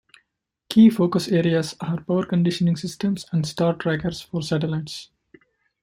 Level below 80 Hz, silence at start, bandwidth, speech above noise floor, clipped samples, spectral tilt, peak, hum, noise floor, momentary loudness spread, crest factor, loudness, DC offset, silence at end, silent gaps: -56 dBFS; 0.7 s; 15.5 kHz; 55 dB; under 0.1%; -6.5 dB/octave; -6 dBFS; none; -76 dBFS; 13 LU; 18 dB; -22 LUFS; under 0.1%; 0.8 s; none